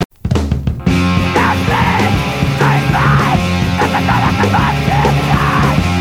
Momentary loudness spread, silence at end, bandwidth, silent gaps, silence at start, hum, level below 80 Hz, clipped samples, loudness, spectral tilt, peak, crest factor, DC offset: 4 LU; 0 s; 16 kHz; 0.05-0.10 s; 0 s; none; -26 dBFS; under 0.1%; -13 LUFS; -6 dB/octave; 0 dBFS; 12 dB; under 0.1%